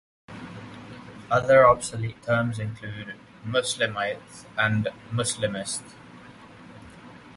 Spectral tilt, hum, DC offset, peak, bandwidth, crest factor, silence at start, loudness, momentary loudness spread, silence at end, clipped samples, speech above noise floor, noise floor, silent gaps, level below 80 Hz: -4.5 dB/octave; none; under 0.1%; -4 dBFS; 11.5 kHz; 22 dB; 0.3 s; -24 LUFS; 26 LU; 0.05 s; under 0.1%; 22 dB; -47 dBFS; none; -54 dBFS